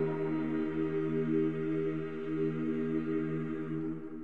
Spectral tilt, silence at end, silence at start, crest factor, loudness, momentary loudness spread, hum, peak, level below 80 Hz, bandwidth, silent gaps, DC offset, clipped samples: -10 dB/octave; 0 s; 0 s; 14 dB; -34 LUFS; 5 LU; none; -20 dBFS; -64 dBFS; 4.2 kHz; none; 0.4%; under 0.1%